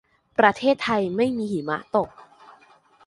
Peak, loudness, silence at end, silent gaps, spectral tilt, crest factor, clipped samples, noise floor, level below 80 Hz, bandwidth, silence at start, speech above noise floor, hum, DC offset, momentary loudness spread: -2 dBFS; -23 LUFS; 0.85 s; none; -6 dB/octave; 22 dB; under 0.1%; -55 dBFS; -60 dBFS; 11.5 kHz; 0.4 s; 33 dB; none; under 0.1%; 9 LU